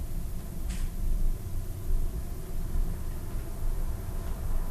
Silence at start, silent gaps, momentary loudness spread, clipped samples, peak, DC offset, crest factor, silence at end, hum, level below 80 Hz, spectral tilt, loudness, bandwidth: 0 s; none; 4 LU; under 0.1%; -16 dBFS; under 0.1%; 12 dB; 0 s; none; -30 dBFS; -6 dB/octave; -37 LUFS; 14.5 kHz